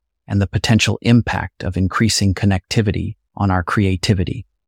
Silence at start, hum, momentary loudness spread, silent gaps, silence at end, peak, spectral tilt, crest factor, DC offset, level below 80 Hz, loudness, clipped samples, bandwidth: 0.3 s; none; 8 LU; none; 0.25 s; -2 dBFS; -5.5 dB/octave; 14 dB; under 0.1%; -38 dBFS; -18 LUFS; under 0.1%; 15.5 kHz